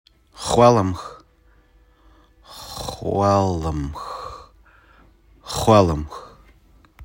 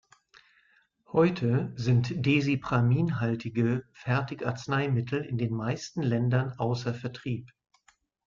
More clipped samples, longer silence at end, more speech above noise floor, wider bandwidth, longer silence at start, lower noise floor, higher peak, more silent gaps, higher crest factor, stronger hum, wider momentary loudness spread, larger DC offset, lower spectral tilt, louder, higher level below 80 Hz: neither; second, 0 s vs 0.8 s; about the same, 37 dB vs 39 dB; first, 16.5 kHz vs 7.4 kHz; second, 0.35 s vs 1.15 s; second, -55 dBFS vs -67 dBFS; first, 0 dBFS vs -12 dBFS; neither; about the same, 22 dB vs 18 dB; neither; first, 24 LU vs 8 LU; neither; second, -6 dB/octave vs -7.5 dB/octave; first, -20 LUFS vs -29 LUFS; first, -42 dBFS vs -60 dBFS